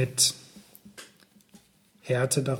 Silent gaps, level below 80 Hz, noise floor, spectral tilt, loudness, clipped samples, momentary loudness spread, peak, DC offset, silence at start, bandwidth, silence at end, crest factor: none; -70 dBFS; -59 dBFS; -3 dB/octave; -25 LUFS; under 0.1%; 25 LU; -8 dBFS; under 0.1%; 0 s; 18 kHz; 0 s; 22 dB